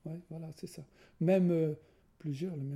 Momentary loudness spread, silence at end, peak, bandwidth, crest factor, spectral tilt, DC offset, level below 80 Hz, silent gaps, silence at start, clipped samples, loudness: 19 LU; 0 s; -18 dBFS; 13.5 kHz; 18 dB; -8.5 dB/octave; under 0.1%; -72 dBFS; none; 0.05 s; under 0.1%; -33 LUFS